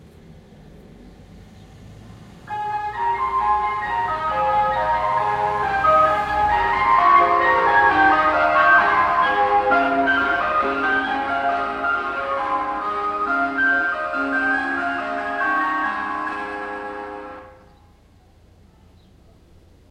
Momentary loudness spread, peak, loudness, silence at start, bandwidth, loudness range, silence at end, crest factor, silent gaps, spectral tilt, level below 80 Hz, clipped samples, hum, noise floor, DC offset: 11 LU; -2 dBFS; -19 LUFS; 0.3 s; 11 kHz; 12 LU; 2.4 s; 18 dB; none; -5 dB/octave; -46 dBFS; under 0.1%; none; -52 dBFS; under 0.1%